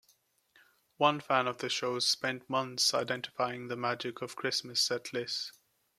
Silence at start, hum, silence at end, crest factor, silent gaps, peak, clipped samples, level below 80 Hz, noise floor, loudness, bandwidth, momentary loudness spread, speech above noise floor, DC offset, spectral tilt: 1 s; none; 0.5 s; 22 dB; none; -12 dBFS; under 0.1%; -80 dBFS; -71 dBFS; -32 LUFS; 15.5 kHz; 8 LU; 38 dB; under 0.1%; -2.5 dB/octave